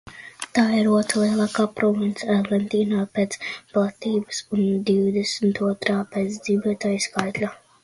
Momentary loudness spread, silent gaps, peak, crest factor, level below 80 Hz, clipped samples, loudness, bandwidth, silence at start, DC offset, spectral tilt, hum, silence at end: 7 LU; none; -2 dBFS; 20 dB; -62 dBFS; under 0.1%; -23 LUFS; 11.5 kHz; 0.05 s; under 0.1%; -5 dB/octave; none; 0.3 s